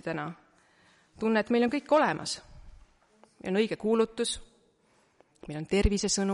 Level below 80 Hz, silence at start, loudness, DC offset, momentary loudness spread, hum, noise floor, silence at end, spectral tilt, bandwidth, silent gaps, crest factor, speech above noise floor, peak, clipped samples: -42 dBFS; 0.05 s; -28 LUFS; under 0.1%; 15 LU; none; -67 dBFS; 0 s; -4.5 dB/octave; 11.5 kHz; none; 18 dB; 39 dB; -12 dBFS; under 0.1%